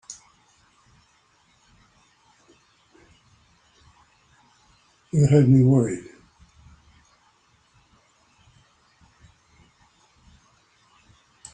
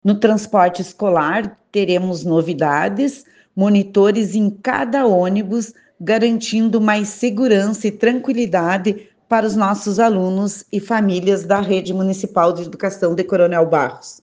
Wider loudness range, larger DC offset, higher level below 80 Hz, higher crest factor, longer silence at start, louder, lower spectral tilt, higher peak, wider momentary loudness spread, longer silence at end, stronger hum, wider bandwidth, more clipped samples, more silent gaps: first, 8 LU vs 1 LU; neither; about the same, -58 dBFS vs -62 dBFS; first, 22 dB vs 16 dB; about the same, 0.1 s vs 0.05 s; about the same, -19 LUFS vs -17 LUFS; first, -8.5 dB/octave vs -6 dB/octave; second, -6 dBFS vs 0 dBFS; first, 29 LU vs 7 LU; first, 5.55 s vs 0.1 s; neither; about the same, 9.4 kHz vs 9.6 kHz; neither; neither